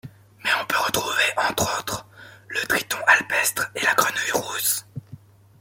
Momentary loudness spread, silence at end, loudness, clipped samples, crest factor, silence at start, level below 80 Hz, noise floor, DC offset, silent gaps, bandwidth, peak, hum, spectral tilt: 12 LU; 0.45 s; -21 LUFS; under 0.1%; 22 dB; 0.05 s; -58 dBFS; -46 dBFS; under 0.1%; none; 17 kHz; -2 dBFS; none; -1 dB/octave